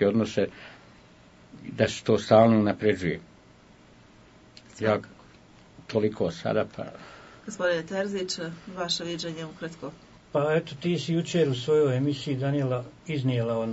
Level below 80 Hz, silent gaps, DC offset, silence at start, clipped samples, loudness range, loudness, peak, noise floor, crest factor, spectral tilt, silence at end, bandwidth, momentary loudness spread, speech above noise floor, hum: -62 dBFS; none; under 0.1%; 0 s; under 0.1%; 6 LU; -27 LUFS; -6 dBFS; -54 dBFS; 22 dB; -6 dB/octave; 0 s; 8 kHz; 17 LU; 28 dB; none